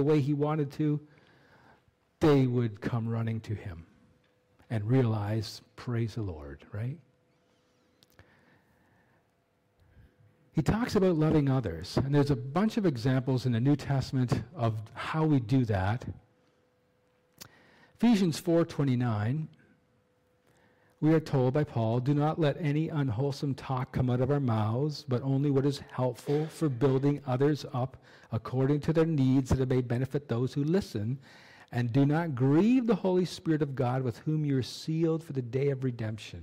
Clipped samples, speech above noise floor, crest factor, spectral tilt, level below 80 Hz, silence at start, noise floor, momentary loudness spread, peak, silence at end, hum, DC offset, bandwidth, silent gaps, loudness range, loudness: under 0.1%; 43 dB; 12 dB; -8 dB/octave; -54 dBFS; 0 s; -71 dBFS; 11 LU; -18 dBFS; 0 s; none; under 0.1%; 15 kHz; none; 5 LU; -29 LUFS